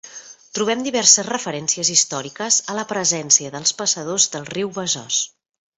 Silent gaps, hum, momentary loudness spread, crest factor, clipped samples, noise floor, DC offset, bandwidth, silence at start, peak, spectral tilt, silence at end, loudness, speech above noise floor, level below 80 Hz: none; none; 12 LU; 22 dB; under 0.1%; -40 dBFS; under 0.1%; 8.6 kHz; 0.05 s; 0 dBFS; -1 dB/octave; 0.5 s; -18 LUFS; 20 dB; -66 dBFS